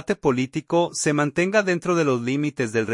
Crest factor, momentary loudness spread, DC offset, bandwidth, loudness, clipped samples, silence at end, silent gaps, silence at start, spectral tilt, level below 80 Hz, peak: 16 dB; 4 LU; under 0.1%; 11.5 kHz; -22 LUFS; under 0.1%; 0 s; none; 0.1 s; -5 dB/octave; -58 dBFS; -6 dBFS